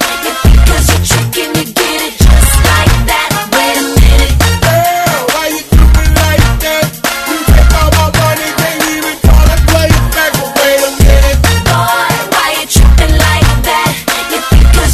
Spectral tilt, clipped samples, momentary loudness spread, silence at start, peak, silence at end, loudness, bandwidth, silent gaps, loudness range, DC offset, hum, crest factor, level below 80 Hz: -4 dB/octave; 2%; 5 LU; 0 s; 0 dBFS; 0 s; -9 LUFS; 14 kHz; none; 1 LU; under 0.1%; none; 8 dB; -10 dBFS